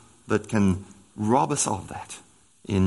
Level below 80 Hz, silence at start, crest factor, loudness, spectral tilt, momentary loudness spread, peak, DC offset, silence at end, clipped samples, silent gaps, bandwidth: -60 dBFS; 0.3 s; 20 dB; -25 LUFS; -5.5 dB/octave; 19 LU; -6 dBFS; under 0.1%; 0 s; under 0.1%; none; 11.5 kHz